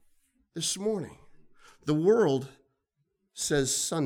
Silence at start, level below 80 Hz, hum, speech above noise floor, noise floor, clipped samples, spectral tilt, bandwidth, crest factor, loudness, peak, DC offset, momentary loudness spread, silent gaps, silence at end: 0.55 s; -58 dBFS; none; 51 dB; -78 dBFS; under 0.1%; -4 dB/octave; 18 kHz; 18 dB; -28 LUFS; -12 dBFS; under 0.1%; 21 LU; none; 0 s